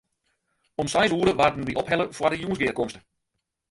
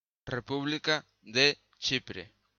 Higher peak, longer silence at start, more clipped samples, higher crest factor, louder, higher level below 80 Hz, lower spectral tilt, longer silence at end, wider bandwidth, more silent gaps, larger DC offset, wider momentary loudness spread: first, -6 dBFS vs -10 dBFS; first, 0.8 s vs 0.25 s; neither; about the same, 20 dB vs 22 dB; first, -24 LUFS vs -30 LUFS; first, -52 dBFS vs -64 dBFS; first, -4.5 dB/octave vs -3 dB/octave; first, 0.7 s vs 0.3 s; first, 11.5 kHz vs 7.4 kHz; neither; neither; second, 10 LU vs 13 LU